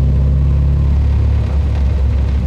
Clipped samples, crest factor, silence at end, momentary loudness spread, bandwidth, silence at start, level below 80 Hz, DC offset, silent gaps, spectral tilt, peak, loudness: under 0.1%; 6 dB; 0 s; 2 LU; 4.8 kHz; 0 s; -14 dBFS; under 0.1%; none; -9.5 dB/octave; -6 dBFS; -15 LUFS